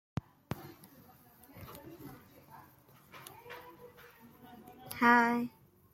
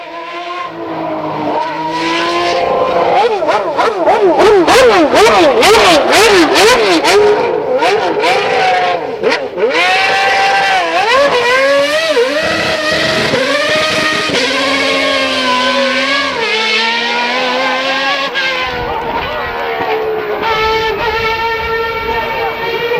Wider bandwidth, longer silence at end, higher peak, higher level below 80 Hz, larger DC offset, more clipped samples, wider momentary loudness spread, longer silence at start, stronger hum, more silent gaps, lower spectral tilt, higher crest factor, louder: about the same, 16.5 kHz vs 16.5 kHz; first, 0.45 s vs 0 s; second, -12 dBFS vs 0 dBFS; second, -70 dBFS vs -40 dBFS; second, under 0.1% vs 0.1%; neither; first, 30 LU vs 10 LU; first, 0.5 s vs 0 s; neither; neither; first, -5.5 dB/octave vs -2.5 dB/octave; first, 26 dB vs 12 dB; second, -31 LUFS vs -11 LUFS